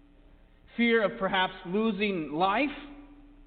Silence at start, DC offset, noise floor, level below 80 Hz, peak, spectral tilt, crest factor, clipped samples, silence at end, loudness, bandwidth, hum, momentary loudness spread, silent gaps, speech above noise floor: 0.75 s; under 0.1%; -56 dBFS; -56 dBFS; -14 dBFS; -9 dB/octave; 16 dB; under 0.1%; 0.05 s; -28 LUFS; 4.7 kHz; none; 13 LU; none; 29 dB